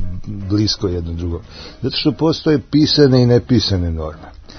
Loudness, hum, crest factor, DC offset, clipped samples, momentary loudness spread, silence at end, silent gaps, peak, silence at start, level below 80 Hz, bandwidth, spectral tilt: -16 LUFS; none; 16 dB; under 0.1%; under 0.1%; 17 LU; 0 s; none; 0 dBFS; 0 s; -36 dBFS; 6.6 kHz; -6.5 dB/octave